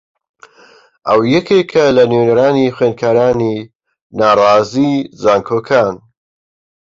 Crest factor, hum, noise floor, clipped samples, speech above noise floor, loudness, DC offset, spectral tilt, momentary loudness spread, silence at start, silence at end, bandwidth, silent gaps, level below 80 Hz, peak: 12 dB; none; -46 dBFS; under 0.1%; 34 dB; -12 LUFS; under 0.1%; -6.5 dB/octave; 9 LU; 1.05 s; 0.85 s; 7.6 kHz; 3.75-3.80 s, 4.02-4.10 s; -50 dBFS; 0 dBFS